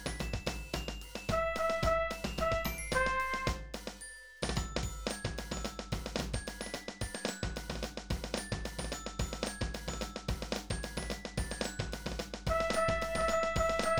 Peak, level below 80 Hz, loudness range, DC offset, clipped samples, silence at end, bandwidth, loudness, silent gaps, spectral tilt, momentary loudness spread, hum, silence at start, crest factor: -16 dBFS; -44 dBFS; 5 LU; under 0.1%; under 0.1%; 0 s; over 20 kHz; -36 LUFS; none; -4 dB/octave; 9 LU; none; 0 s; 20 dB